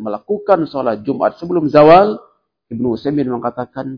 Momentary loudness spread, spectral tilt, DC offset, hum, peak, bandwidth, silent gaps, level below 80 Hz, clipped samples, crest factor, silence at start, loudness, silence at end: 15 LU; -9 dB/octave; under 0.1%; none; 0 dBFS; 5.4 kHz; none; -50 dBFS; 0.4%; 14 dB; 0 s; -14 LUFS; 0 s